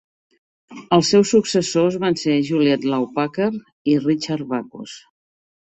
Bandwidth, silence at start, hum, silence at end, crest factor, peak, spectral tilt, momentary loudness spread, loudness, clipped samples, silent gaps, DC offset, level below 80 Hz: 8.4 kHz; 0.7 s; none; 0.7 s; 18 dB; -2 dBFS; -5 dB/octave; 12 LU; -19 LUFS; under 0.1%; 3.72-3.85 s; under 0.1%; -60 dBFS